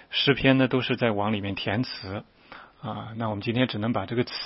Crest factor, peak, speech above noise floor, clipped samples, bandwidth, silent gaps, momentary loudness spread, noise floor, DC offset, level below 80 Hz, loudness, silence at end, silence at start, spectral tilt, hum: 22 dB; -4 dBFS; 22 dB; under 0.1%; 5.8 kHz; none; 15 LU; -47 dBFS; under 0.1%; -54 dBFS; -26 LUFS; 0 s; 0.1 s; -9.5 dB/octave; none